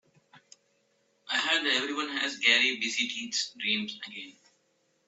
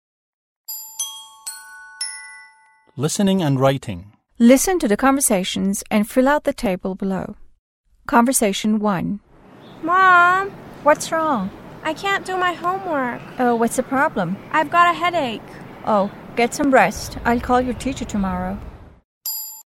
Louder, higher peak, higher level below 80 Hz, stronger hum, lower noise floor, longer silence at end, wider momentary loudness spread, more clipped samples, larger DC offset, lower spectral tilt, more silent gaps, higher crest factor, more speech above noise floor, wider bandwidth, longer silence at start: second, -27 LUFS vs -19 LUFS; second, -6 dBFS vs 0 dBFS; second, -84 dBFS vs -44 dBFS; neither; first, -72 dBFS vs -53 dBFS; first, 0.75 s vs 0.05 s; about the same, 17 LU vs 17 LU; neither; neither; second, -0.5 dB/octave vs -4.5 dB/octave; second, none vs 7.59-7.84 s, 19.04-19.21 s; first, 26 dB vs 20 dB; first, 42 dB vs 35 dB; second, 8.4 kHz vs 16.5 kHz; second, 0.35 s vs 0.7 s